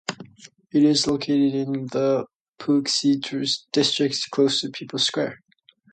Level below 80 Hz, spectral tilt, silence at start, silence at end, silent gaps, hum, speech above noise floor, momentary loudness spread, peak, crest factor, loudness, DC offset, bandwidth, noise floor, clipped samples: -64 dBFS; -4 dB/octave; 0.1 s; 0.55 s; 2.35-2.53 s; none; 28 dB; 11 LU; -6 dBFS; 16 dB; -22 LUFS; under 0.1%; 9.4 kHz; -50 dBFS; under 0.1%